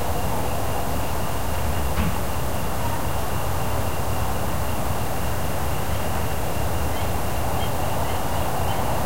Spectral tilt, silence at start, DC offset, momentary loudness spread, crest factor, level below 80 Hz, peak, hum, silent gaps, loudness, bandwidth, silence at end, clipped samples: -5 dB/octave; 0 s; 7%; 2 LU; 14 dB; -32 dBFS; -10 dBFS; none; none; -26 LUFS; 16 kHz; 0 s; under 0.1%